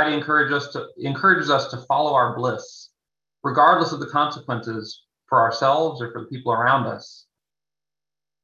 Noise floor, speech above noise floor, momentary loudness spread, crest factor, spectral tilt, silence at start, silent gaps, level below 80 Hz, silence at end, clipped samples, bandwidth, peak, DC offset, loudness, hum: under -90 dBFS; over 69 dB; 15 LU; 20 dB; -5.5 dB/octave; 0 s; none; -68 dBFS; 1.3 s; under 0.1%; 7.6 kHz; -2 dBFS; under 0.1%; -20 LUFS; 50 Hz at -65 dBFS